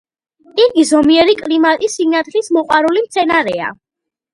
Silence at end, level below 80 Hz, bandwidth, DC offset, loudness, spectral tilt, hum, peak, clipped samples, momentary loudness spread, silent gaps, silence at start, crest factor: 0.6 s; -52 dBFS; 11.5 kHz; under 0.1%; -13 LUFS; -3 dB/octave; none; 0 dBFS; under 0.1%; 8 LU; none; 0.55 s; 14 dB